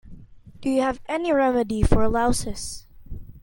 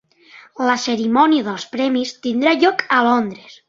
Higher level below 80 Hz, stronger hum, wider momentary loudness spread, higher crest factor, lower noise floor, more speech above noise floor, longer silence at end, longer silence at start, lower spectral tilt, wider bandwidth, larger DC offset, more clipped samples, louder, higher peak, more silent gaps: first, -32 dBFS vs -64 dBFS; neither; first, 20 LU vs 8 LU; about the same, 20 dB vs 16 dB; about the same, -44 dBFS vs -46 dBFS; second, 23 dB vs 29 dB; about the same, 0.05 s vs 0.15 s; second, 0.05 s vs 0.35 s; first, -5.5 dB/octave vs -4 dB/octave; first, 17 kHz vs 7.6 kHz; neither; neither; second, -23 LUFS vs -17 LUFS; about the same, -2 dBFS vs -2 dBFS; neither